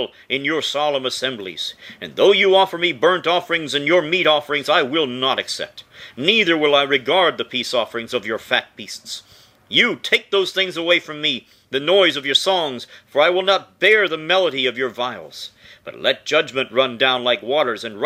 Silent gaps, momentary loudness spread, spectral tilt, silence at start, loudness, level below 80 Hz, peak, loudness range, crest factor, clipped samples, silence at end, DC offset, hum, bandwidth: none; 14 LU; -3 dB/octave; 0 s; -18 LUFS; -68 dBFS; 0 dBFS; 3 LU; 20 dB; under 0.1%; 0 s; under 0.1%; none; 15.5 kHz